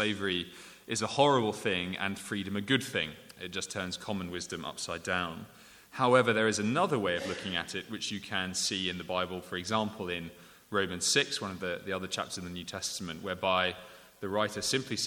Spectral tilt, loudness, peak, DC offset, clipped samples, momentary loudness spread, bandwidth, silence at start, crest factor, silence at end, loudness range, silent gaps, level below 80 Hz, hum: -3.5 dB/octave; -32 LUFS; -10 dBFS; under 0.1%; under 0.1%; 12 LU; 19.5 kHz; 0 s; 22 dB; 0 s; 4 LU; none; -66 dBFS; none